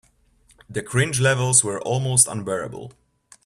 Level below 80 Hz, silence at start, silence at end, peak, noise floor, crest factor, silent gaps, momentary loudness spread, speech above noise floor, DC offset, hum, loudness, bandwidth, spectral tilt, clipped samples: -56 dBFS; 0.7 s; 0.55 s; -2 dBFS; -59 dBFS; 22 dB; none; 15 LU; 37 dB; under 0.1%; none; -19 LUFS; 14.5 kHz; -3.5 dB/octave; under 0.1%